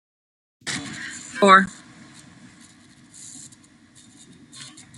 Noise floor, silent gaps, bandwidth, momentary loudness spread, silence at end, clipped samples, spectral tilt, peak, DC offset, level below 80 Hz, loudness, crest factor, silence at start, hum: -52 dBFS; none; 12 kHz; 27 LU; 0.35 s; under 0.1%; -3.5 dB/octave; -2 dBFS; under 0.1%; -66 dBFS; -19 LUFS; 24 dB; 0.65 s; none